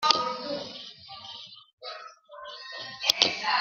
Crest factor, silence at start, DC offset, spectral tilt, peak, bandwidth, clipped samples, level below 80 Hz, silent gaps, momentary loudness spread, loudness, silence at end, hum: 30 dB; 0 s; under 0.1%; -0.5 dB/octave; -2 dBFS; 13.5 kHz; under 0.1%; -74 dBFS; 1.73-1.78 s; 21 LU; -27 LUFS; 0 s; none